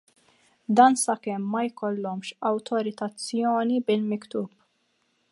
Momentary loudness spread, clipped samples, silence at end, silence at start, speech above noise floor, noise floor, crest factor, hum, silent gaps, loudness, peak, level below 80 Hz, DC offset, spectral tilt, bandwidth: 14 LU; under 0.1%; 0.85 s; 0.7 s; 46 dB; -71 dBFS; 22 dB; none; none; -25 LUFS; -4 dBFS; -78 dBFS; under 0.1%; -4.5 dB/octave; 11.5 kHz